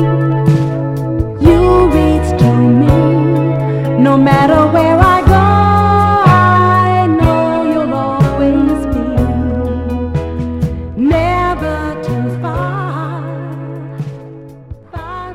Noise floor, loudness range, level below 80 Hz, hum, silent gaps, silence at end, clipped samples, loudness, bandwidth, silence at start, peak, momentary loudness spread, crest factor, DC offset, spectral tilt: -32 dBFS; 8 LU; -24 dBFS; none; none; 0 s; 0.1%; -12 LUFS; 14.5 kHz; 0 s; 0 dBFS; 13 LU; 12 dB; under 0.1%; -8.5 dB/octave